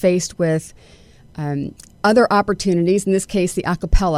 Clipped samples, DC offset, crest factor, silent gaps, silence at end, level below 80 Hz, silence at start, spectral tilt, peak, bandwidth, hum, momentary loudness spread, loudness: under 0.1%; under 0.1%; 16 dB; none; 0 s; -26 dBFS; 0 s; -5.5 dB/octave; -2 dBFS; 15 kHz; none; 13 LU; -19 LUFS